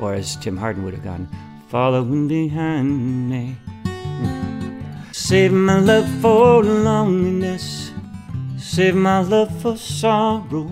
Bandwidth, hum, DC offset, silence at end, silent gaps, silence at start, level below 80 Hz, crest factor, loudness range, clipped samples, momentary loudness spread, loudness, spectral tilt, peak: 15.5 kHz; none; under 0.1%; 0 s; none; 0 s; -46 dBFS; 16 dB; 6 LU; under 0.1%; 16 LU; -18 LUFS; -6 dB/octave; -2 dBFS